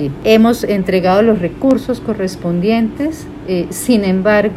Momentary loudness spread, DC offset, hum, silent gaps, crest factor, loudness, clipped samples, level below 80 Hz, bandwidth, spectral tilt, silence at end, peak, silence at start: 9 LU; under 0.1%; none; none; 14 dB; -14 LUFS; under 0.1%; -40 dBFS; 15.5 kHz; -6 dB/octave; 0 s; 0 dBFS; 0 s